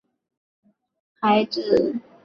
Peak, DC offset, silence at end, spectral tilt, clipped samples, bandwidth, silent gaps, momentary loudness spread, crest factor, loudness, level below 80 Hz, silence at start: -6 dBFS; under 0.1%; 0.25 s; -6.5 dB/octave; under 0.1%; 7.2 kHz; none; 6 LU; 18 dB; -21 LUFS; -62 dBFS; 1.2 s